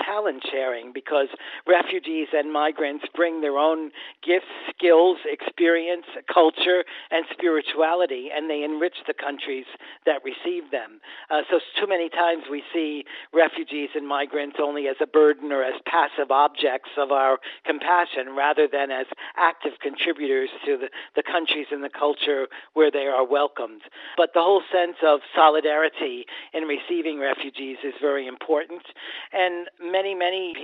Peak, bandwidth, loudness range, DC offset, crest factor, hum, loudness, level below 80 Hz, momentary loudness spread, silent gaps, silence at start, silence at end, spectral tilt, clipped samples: -4 dBFS; 5 kHz; 5 LU; under 0.1%; 20 dB; none; -23 LUFS; -84 dBFS; 11 LU; none; 0 s; 0 s; 1.5 dB/octave; under 0.1%